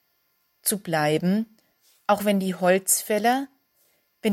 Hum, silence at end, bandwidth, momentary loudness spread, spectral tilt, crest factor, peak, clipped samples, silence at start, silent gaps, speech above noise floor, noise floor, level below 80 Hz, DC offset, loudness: none; 0 s; 17 kHz; 9 LU; -4 dB/octave; 18 dB; -6 dBFS; under 0.1%; 0.65 s; none; 47 dB; -70 dBFS; -70 dBFS; under 0.1%; -23 LUFS